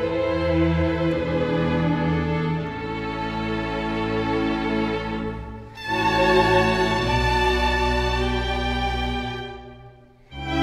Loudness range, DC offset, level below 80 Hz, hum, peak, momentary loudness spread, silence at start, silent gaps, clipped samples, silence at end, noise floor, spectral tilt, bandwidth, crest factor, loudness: 5 LU; under 0.1%; -34 dBFS; none; -6 dBFS; 11 LU; 0 s; none; under 0.1%; 0 s; -47 dBFS; -6 dB/octave; 13 kHz; 18 dB; -23 LUFS